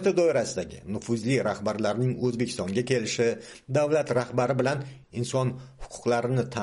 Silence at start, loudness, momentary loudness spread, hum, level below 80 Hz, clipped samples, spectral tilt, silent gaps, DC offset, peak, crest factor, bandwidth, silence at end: 0 s; -27 LUFS; 10 LU; none; -56 dBFS; under 0.1%; -5.5 dB/octave; none; under 0.1%; -12 dBFS; 16 dB; 11.5 kHz; 0 s